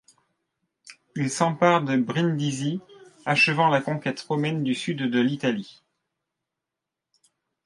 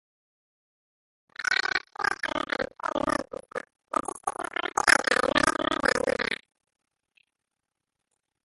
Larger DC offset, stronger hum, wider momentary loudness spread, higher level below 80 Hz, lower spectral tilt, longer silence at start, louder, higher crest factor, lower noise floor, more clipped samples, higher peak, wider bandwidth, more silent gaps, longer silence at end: neither; neither; second, 11 LU vs 14 LU; second, -72 dBFS vs -56 dBFS; first, -5.5 dB/octave vs -2 dB/octave; second, 0.85 s vs 1.4 s; about the same, -24 LUFS vs -26 LUFS; about the same, 22 dB vs 26 dB; about the same, -86 dBFS vs -86 dBFS; neither; about the same, -4 dBFS vs -2 dBFS; about the same, 11.5 kHz vs 12 kHz; neither; second, 1.95 s vs 2.1 s